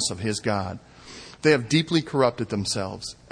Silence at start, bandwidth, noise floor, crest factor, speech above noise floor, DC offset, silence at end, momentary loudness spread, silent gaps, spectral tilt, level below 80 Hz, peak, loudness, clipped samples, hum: 0 s; 10.5 kHz; -44 dBFS; 20 dB; 19 dB; under 0.1%; 0.2 s; 20 LU; none; -4.5 dB/octave; -56 dBFS; -6 dBFS; -24 LUFS; under 0.1%; none